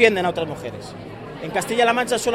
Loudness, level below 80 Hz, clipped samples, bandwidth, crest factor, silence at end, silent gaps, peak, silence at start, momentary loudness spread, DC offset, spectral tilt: -21 LUFS; -54 dBFS; under 0.1%; 16 kHz; 20 dB; 0 s; none; 0 dBFS; 0 s; 17 LU; under 0.1%; -3.5 dB/octave